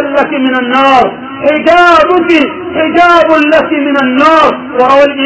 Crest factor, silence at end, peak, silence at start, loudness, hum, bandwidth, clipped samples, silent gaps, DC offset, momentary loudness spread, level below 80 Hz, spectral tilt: 8 dB; 0 s; 0 dBFS; 0 s; -7 LUFS; none; 8 kHz; 5%; none; 0.2%; 6 LU; -42 dBFS; -5 dB/octave